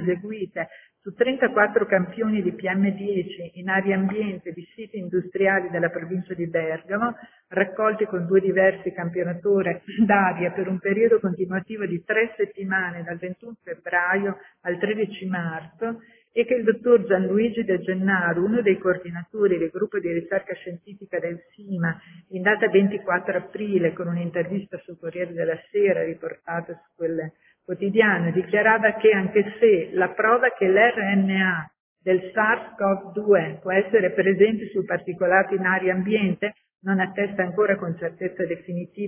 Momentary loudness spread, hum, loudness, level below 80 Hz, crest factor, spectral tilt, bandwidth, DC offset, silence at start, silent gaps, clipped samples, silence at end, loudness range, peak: 14 LU; none; -23 LUFS; -64 dBFS; 20 dB; -10 dB/octave; 3.6 kHz; under 0.1%; 0 s; 31.80-31.96 s; under 0.1%; 0 s; 6 LU; -4 dBFS